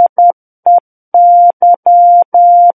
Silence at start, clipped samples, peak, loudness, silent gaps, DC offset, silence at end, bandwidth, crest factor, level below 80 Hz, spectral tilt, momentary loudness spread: 0 s; under 0.1%; -2 dBFS; -8 LUFS; 0.09-0.16 s, 0.33-0.63 s, 0.80-1.12 s, 1.53-1.60 s, 1.76-1.83 s, 2.25-2.32 s; under 0.1%; 0.05 s; 1.3 kHz; 6 dB; -70 dBFS; -10 dB/octave; 6 LU